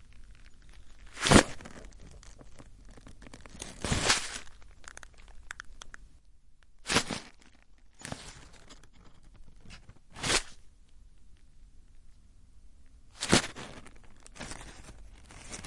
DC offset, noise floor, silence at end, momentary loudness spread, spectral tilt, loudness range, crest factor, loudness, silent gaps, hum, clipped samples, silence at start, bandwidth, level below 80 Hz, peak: under 0.1%; -55 dBFS; 0 s; 27 LU; -3 dB/octave; 7 LU; 34 dB; -29 LUFS; none; none; under 0.1%; 0 s; 11.5 kHz; -48 dBFS; -2 dBFS